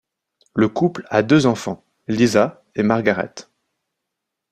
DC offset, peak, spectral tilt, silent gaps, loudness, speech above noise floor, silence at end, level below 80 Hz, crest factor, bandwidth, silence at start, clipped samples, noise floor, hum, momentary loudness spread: under 0.1%; 0 dBFS; -6 dB/octave; none; -19 LUFS; 63 dB; 1.1 s; -56 dBFS; 20 dB; 14 kHz; 0.55 s; under 0.1%; -81 dBFS; none; 14 LU